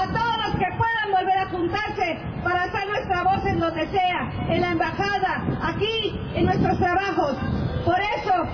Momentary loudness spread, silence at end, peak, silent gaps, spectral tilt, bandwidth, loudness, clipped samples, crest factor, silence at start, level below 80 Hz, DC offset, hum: 4 LU; 0 s; -8 dBFS; none; -6.5 dB/octave; 5.4 kHz; -23 LUFS; under 0.1%; 14 dB; 0 s; -40 dBFS; under 0.1%; none